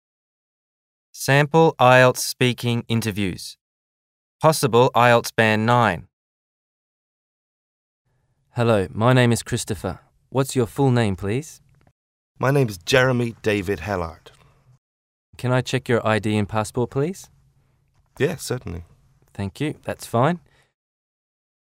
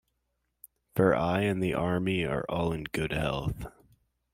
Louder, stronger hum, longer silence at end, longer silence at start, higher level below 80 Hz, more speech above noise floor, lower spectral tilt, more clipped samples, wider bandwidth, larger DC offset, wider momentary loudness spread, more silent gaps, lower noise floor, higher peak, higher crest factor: first, -20 LUFS vs -29 LUFS; neither; first, 1.3 s vs 0.65 s; first, 1.15 s vs 0.95 s; about the same, -52 dBFS vs -50 dBFS; second, 45 dB vs 51 dB; second, -5.5 dB/octave vs -7 dB/octave; neither; about the same, 16 kHz vs 16 kHz; neither; first, 16 LU vs 10 LU; first, 3.61-4.39 s, 6.13-8.05 s, 11.91-12.35 s, 14.78-15.33 s vs none; second, -65 dBFS vs -79 dBFS; first, 0 dBFS vs -10 dBFS; about the same, 22 dB vs 20 dB